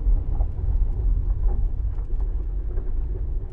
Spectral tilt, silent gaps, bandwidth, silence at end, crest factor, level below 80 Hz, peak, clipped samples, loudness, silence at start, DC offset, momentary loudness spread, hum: -11.5 dB/octave; none; 1.8 kHz; 0 s; 12 dB; -22 dBFS; -10 dBFS; under 0.1%; -28 LUFS; 0 s; under 0.1%; 5 LU; none